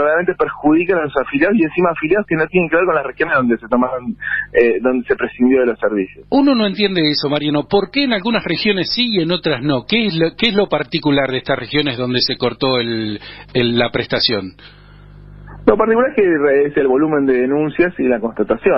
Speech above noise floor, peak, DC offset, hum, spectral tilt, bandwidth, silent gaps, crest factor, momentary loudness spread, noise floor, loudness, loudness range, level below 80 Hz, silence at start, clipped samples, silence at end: 24 dB; 0 dBFS; under 0.1%; none; -8 dB/octave; 5.8 kHz; none; 16 dB; 5 LU; -39 dBFS; -16 LUFS; 2 LU; -44 dBFS; 0 s; under 0.1%; 0 s